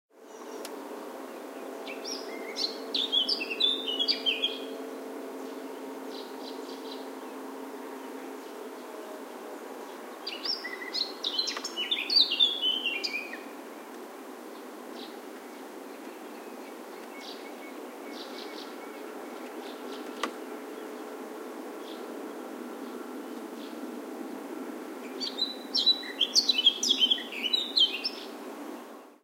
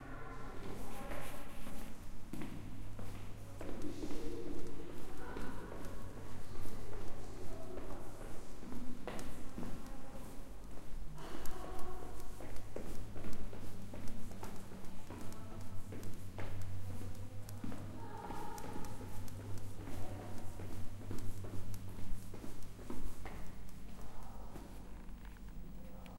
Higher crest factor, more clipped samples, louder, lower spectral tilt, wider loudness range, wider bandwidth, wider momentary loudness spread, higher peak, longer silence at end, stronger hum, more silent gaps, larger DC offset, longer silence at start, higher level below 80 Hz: first, 24 dB vs 14 dB; neither; first, -30 LUFS vs -50 LUFS; second, 0 dB/octave vs -6 dB/octave; first, 16 LU vs 2 LU; about the same, 16 kHz vs 15.5 kHz; first, 20 LU vs 6 LU; first, -10 dBFS vs -20 dBFS; about the same, 0.1 s vs 0 s; neither; neither; neither; first, 0.15 s vs 0 s; second, under -90 dBFS vs -50 dBFS